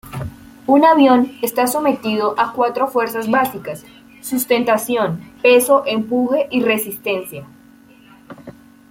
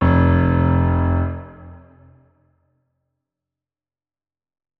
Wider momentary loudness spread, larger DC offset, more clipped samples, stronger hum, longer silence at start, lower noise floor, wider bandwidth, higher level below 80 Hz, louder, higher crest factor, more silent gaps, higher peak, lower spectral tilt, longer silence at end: about the same, 18 LU vs 16 LU; neither; neither; neither; about the same, 0.05 s vs 0 s; second, -46 dBFS vs under -90 dBFS; first, 17 kHz vs 4.1 kHz; second, -54 dBFS vs -32 dBFS; about the same, -16 LUFS vs -18 LUFS; about the same, 16 dB vs 18 dB; neither; about the same, -2 dBFS vs -4 dBFS; second, -4.5 dB/octave vs -11.5 dB/octave; second, 0.4 s vs 3 s